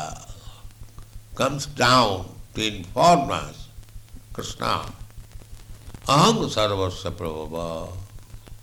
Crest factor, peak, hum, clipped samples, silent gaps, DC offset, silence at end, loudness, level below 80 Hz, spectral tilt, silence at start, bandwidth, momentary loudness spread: 18 dB; -6 dBFS; none; under 0.1%; none; under 0.1%; 0.05 s; -22 LUFS; -42 dBFS; -4.5 dB/octave; 0 s; 19.5 kHz; 26 LU